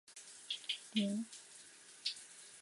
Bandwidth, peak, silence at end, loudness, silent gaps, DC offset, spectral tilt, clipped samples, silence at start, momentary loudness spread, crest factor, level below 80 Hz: 11.5 kHz; -24 dBFS; 0 s; -41 LUFS; none; under 0.1%; -3.5 dB/octave; under 0.1%; 0.1 s; 17 LU; 20 dB; under -90 dBFS